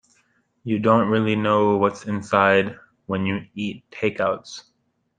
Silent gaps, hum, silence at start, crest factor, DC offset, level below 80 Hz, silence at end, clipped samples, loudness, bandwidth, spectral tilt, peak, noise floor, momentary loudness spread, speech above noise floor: none; none; 0.65 s; 20 dB; under 0.1%; -64 dBFS; 0.6 s; under 0.1%; -21 LUFS; 9.4 kHz; -6.5 dB/octave; -2 dBFS; -65 dBFS; 13 LU; 44 dB